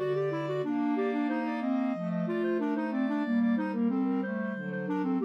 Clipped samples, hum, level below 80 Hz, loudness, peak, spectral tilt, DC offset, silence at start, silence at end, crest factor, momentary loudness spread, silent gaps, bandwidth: under 0.1%; none; -86 dBFS; -30 LUFS; -18 dBFS; -9 dB/octave; under 0.1%; 0 s; 0 s; 10 dB; 4 LU; none; 6.2 kHz